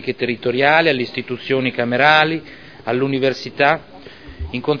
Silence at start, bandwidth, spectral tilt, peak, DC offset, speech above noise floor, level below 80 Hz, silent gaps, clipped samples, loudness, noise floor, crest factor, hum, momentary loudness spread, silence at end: 0 s; 5.4 kHz; -6 dB/octave; 0 dBFS; 0.4%; 20 dB; -44 dBFS; none; under 0.1%; -17 LUFS; -37 dBFS; 18 dB; none; 13 LU; 0 s